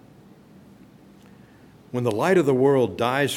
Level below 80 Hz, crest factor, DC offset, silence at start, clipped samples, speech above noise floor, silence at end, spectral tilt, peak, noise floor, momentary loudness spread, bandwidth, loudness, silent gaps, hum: -64 dBFS; 16 dB; under 0.1%; 1.95 s; under 0.1%; 30 dB; 0 s; -6 dB/octave; -8 dBFS; -50 dBFS; 8 LU; 16.5 kHz; -21 LUFS; none; none